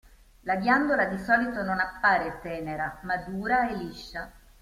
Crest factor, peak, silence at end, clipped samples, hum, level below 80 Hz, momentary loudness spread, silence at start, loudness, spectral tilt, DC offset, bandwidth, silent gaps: 18 dB; -10 dBFS; 0.25 s; under 0.1%; none; -52 dBFS; 15 LU; 0.45 s; -27 LUFS; -6 dB/octave; under 0.1%; 15.5 kHz; none